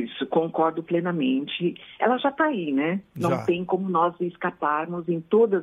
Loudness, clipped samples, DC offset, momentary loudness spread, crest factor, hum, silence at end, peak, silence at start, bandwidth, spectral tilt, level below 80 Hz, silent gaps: -25 LUFS; under 0.1%; under 0.1%; 6 LU; 18 dB; none; 0 s; -6 dBFS; 0 s; 11.5 kHz; -7.5 dB/octave; -68 dBFS; none